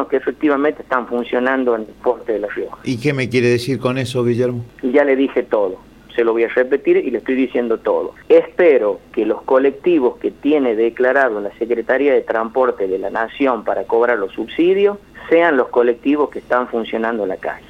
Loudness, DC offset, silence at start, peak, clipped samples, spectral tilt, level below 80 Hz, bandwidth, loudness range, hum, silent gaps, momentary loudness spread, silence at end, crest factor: -17 LUFS; under 0.1%; 0 s; -2 dBFS; under 0.1%; -7 dB/octave; -52 dBFS; 12 kHz; 3 LU; none; none; 7 LU; 0.1 s; 16 dB